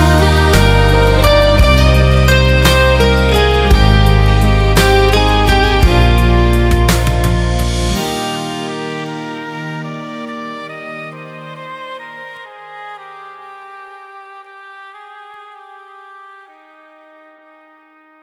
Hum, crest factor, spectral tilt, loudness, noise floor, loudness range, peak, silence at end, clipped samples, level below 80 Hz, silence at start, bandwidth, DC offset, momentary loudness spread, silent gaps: none; 12 dB; -5.5 dB/octave; -11 LUFS; -47 dBFS; 21 LU; 0 dBFS; 2.8 s; under 0.1%; -16 dBFS; 0 s; 16 kHz; under 0.1%; 22 LU; none